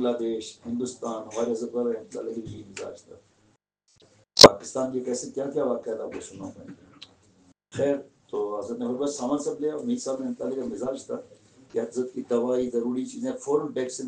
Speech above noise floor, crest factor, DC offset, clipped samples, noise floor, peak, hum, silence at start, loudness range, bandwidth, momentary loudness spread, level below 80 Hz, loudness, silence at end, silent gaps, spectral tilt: 37 dB; 26 dB; under 0.1%; under 0.1%; -67 dBFS; 0 dBFS; none; 0 s; 11 LU; 10 kHz; 11 LU; -58 dBFS; -25 LUFS; 0 s; none; -3.5 dB/octave